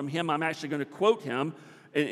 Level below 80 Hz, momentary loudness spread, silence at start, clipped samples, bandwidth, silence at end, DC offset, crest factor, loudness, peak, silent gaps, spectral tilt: -84 dBFS; 8 LU; 0 s; under 0.1%; 13 kHz; 0 s; under 0.1%; 20 dB; -29 LUFS; -10 dBFS; none; -5.5 dB/octave